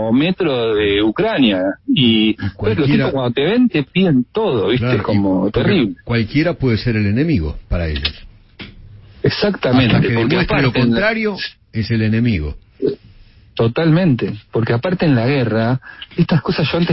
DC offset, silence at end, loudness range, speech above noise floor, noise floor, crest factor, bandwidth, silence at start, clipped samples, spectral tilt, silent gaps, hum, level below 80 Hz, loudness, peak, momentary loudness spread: under 0.1%; 0 s; 3 LU; 29 dB; -44 dBFS; 14 dB; 5.8 kHz; 0 s; under 0.1%; -10.5 dB/octave; none; none; -34 dBFS; -16 LUFS; -2 dBFS; 8 LU